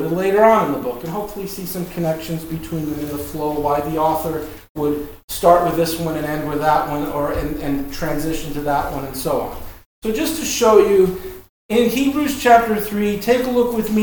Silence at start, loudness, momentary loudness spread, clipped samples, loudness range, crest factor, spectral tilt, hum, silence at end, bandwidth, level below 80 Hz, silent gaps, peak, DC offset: 0 s; -19 LUFS; 13 LU; under 0.1%; 7 LU; 18 dB; -5 dB/octave; none; 0 s; over 20 kHz; -38 dBFS; 4.69-4.75 s, 5.24-5.28 s, 9.86-10.02 s, 11.49-11.69 s; 0 dBFS; under 0.1%